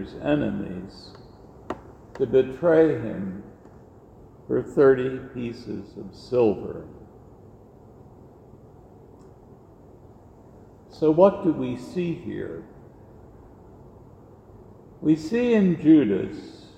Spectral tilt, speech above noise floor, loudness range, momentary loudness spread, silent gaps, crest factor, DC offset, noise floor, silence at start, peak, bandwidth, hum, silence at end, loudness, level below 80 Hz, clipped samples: -8.5 dB/octave; 27 dB; 9 LU; 22 LU; none; 22 dB; under 0.1%; -49 dBFS; 0 s; -4 dBFS; 8.4 kHz; none; 0.1 s; -23 LUFS; -54 dBFS; under 0.1%